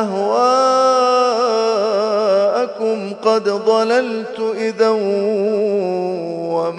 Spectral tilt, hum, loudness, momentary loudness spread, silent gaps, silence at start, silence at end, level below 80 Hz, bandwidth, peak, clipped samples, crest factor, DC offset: -4.5 dB/octave; none; -16 LUFS; 8 LU; none; 0 s; 0 s; -72 dBFS; 10 kHz; -2 dBFS; under 0.1%; 14 dB; under 0.1%